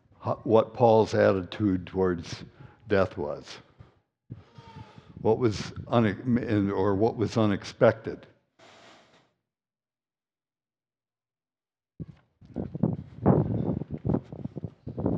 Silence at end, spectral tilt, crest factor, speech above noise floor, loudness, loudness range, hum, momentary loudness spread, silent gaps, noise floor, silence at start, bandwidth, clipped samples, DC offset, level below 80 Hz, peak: 0 s; -7.5 dB/octave; 22 dB; over 65 dB; -26 LUFS; 9 LU; none; 21 LU; none; under -90 dBFS; 0.2 s; 8.8 kHz; under 0.1%; under 0.1%; -56 dBFS; -6 dBFS